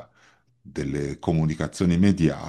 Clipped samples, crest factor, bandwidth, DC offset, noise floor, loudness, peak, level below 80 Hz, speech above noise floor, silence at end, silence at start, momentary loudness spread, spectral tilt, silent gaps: under 0.1%; 18 dB; 11.5 kHz; under 0.1%; -60 dBFS; -24 LUFS; -6 dBFS; -46 dBFS; 37 dB; 0 s; 0 s; 11 LU; -7.5 dB/octave; none